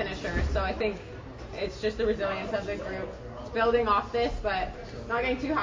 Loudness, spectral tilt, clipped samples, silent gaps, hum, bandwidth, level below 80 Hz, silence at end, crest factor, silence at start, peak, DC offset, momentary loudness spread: -29 LUFS; -6 dB/octave; under 0.1%; none; none; 7.6 kHz; -40 dBFS; 0 s; 16 dB; 0 s; -12 dBFS; under 0.1%; 14 LU